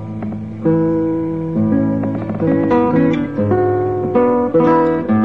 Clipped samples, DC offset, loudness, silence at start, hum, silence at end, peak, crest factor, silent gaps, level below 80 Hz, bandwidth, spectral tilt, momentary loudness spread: under 0.1%; 0.6%; -16 LUFS; 0 s; none; 0 s; -2 dBFS; 12 dB; none; -44 dBFS; 5.6 kHz; -10.5 dB/octave; 7 LU